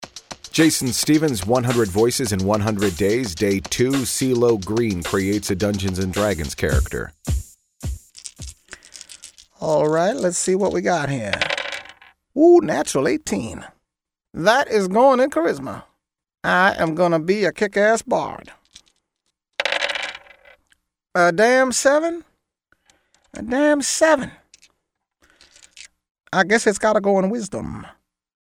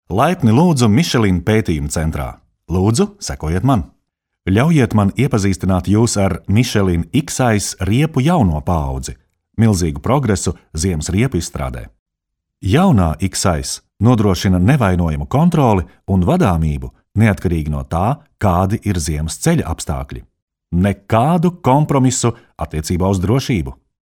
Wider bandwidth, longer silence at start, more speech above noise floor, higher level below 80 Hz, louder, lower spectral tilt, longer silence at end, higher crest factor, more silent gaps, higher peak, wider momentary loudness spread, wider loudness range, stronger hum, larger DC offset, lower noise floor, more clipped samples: about the same, 16.5 kHz vs 17 kHz; about the same, 0 s vs 0.1 s; about the same, 64 dB vs 63 dB; second, -40 dBFS vs -32 dBFS; second, -19 LUFS vs -16 LUFS; second, -4.5 dB/octave vs -6 dB/octave; first, 0.7 s vs 0.3 s; about the same, 20 dB vs 16 dB; second, 26.11-26.15 s vs 11.99-12.06 s, 20.42-20.48 s; about the same, -2 dBFS vs 0 dBFS; first, 18 LU vs 11 LU; about the same, 5 LU vs 4 LU; neither; neither; first, -83 dBFS vs -78 dBFS; neither